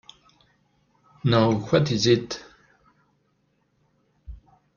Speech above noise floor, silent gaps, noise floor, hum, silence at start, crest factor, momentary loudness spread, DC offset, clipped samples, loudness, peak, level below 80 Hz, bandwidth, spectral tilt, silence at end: 48 dB; none; -69 dBFS; none; 1.25 s; 22 dB; 16 LU; under 0.1%; under 0.1%; -22 LUFS; -6 dBFS; -54 dBFS; 7.2 kHz; -6 dB/octave; 0.4 s